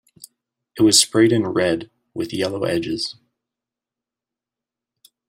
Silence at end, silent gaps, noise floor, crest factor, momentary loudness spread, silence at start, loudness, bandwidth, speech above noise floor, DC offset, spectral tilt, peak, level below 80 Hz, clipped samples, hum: 2.15 s; none; -88 dBFS; 20 dB; 16 LU; 0.75 s; -18 LUFS; 16 kHz; 69 dB; under 0.1%; -3.5 dB/octave; -2 dBFS; -60 dBFS; under 0.1%; none